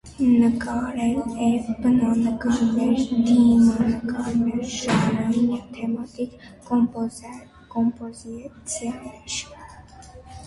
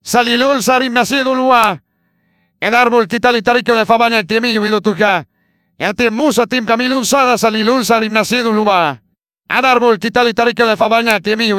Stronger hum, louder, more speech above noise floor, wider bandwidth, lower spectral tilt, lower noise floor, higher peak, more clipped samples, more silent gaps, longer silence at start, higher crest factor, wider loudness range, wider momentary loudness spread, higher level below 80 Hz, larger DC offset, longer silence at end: neither; second, -22 LUFS vs -12 LUFS; second, 23 dB vs 49 dB; second, 11.5 kHz vs 16 kHz; first, -5.5 dB/octave vs -3.5 dB/octave; second, -44 dBFS vs -61 dBFS; second, -8 dBFS vs 0 dBFS; neither; neither; about the same, 0.05 s vs 0.05 s; about the same, 14 dB vs 14 dB; first, 8 LU vs 1 LU; first, 18 LU vs 4 LU; about the same, -48 dBFS vs -52 dBFS; neither; about the same, 0 s vs 0 s